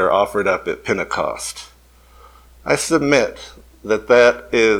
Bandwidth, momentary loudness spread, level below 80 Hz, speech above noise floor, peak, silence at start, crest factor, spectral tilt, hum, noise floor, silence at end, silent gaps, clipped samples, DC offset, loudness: 17.5 kHz; 20 LU; -46 dBFS; 31 dB; 0 dBFS; 0 s; 18 dB; -4 dB/octave; none; -48 dBFS; 0 s; none; under 0.1%; under 0.1%; -17 LUFS